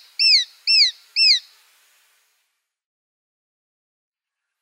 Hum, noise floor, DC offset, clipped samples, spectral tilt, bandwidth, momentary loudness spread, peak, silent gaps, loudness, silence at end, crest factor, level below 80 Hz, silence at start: none; -84 dBFS; under 0.1%; under 0.1%; 11 dB/octave; 16 kHz; 3 LU; -6 dBFS; none; -15 LUFS; 3.25 s; 18 dB; under -90 dBFS; 0.2 s